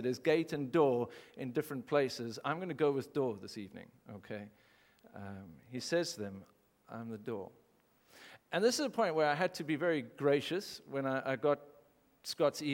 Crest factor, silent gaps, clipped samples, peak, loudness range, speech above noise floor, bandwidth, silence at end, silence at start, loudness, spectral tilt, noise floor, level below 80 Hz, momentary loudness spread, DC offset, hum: 20 dB; none; under 0.1%; -16 dBFS; 8 LU; 35 dB; 17 kHz; 0 s; 0 s; -35 LUFS; -5 dB/octave; -70 dBFS; -80 dBFS; 19 LU; under 0.1%; none